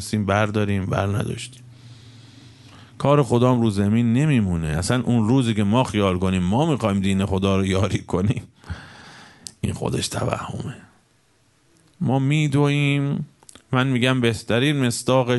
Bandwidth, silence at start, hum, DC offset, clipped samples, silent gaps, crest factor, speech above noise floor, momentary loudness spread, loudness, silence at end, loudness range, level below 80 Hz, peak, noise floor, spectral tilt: 11.5 kHz; 0 s; none; under 0.1%; under 0.1%; none; 18 dB; 41 dB; 12 LU; -21 LUFS; 0 s; 8 LU; -46 dBFS; -2 dBFS; -61 dBFS; -6 dB/octave